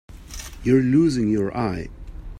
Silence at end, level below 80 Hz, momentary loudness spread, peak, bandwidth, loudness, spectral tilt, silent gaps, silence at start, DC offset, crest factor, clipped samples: 0 s; -40 dBFS; 20 LU; -6 dBFS; 15.5 kHz; -21 LUFS; -7 dB/octave; none; 0.1 s; under 0.1%; 16 dB; under 0.1%